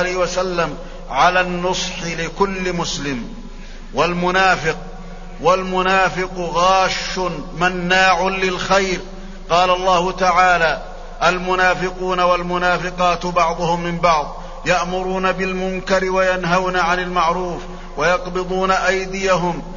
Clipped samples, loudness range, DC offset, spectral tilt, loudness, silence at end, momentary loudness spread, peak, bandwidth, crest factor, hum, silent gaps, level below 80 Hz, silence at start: under 0.1%; 3 LU; under 0.1%; -4 dB/octave; -18 LUFS; 0 s; 11 LU; -2 dBFS; 7.4 kHz; 16 dB; none; none; -32 dBFS; 0 s